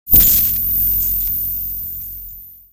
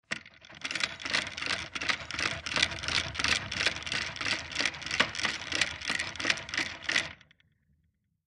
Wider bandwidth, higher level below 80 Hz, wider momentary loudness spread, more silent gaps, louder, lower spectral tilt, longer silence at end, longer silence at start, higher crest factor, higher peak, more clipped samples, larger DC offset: first, over 20 kHz vs 13 kHz; first, -32 dBFS vs -56 dBFS; first, 19 LU vs 5 LU; neither; first, -13 LUFS vs -30 LUFS; first, -3 dB/octave vs -1 dB/octave; second, 0.15 s vs 1.1 s; about the same, 0.05 s vs 0.1 s; second, 16 dB vs 26 dB; first, 0 dBFS vs -8 dBFS; neither; neither